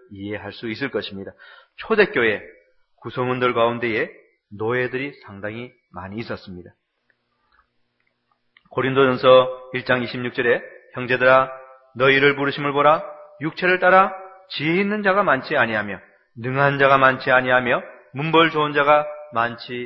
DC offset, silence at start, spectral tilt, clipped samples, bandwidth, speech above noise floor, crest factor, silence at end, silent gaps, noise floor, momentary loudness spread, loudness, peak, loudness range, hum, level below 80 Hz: under 0.1%; 0.1 s; -8 dB/octave; under 0.1%; 6 kHz; 50 dB; 20 dB; 0 s; none; -70 dBFS; 18 LU; -19 LUFS; 0 dBFS; 12 LU; none; -60 dBFS